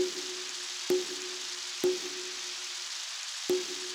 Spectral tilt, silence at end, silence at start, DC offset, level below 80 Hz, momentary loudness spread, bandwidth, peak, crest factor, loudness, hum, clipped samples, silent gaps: -1 dB/octave; 0 s; 0 s; under 0.1%; -78 dBFS; 5 LU; over 20 kHz; -18 dBFS; 18 dB; -33 LUFS; none; under 0.1%; none